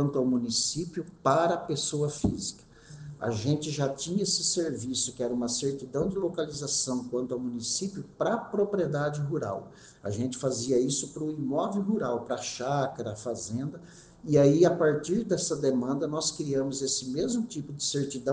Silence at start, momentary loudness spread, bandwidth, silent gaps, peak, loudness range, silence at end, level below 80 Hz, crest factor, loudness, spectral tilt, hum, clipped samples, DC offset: 0 s; 9 LU; 10 kHz; none; -10 dBFS; 4 LU; 0 s; -58 dBFS; 20 dB; -29 LUFS; -4.5 dB/octave; none; under 0.1%; under 0.1%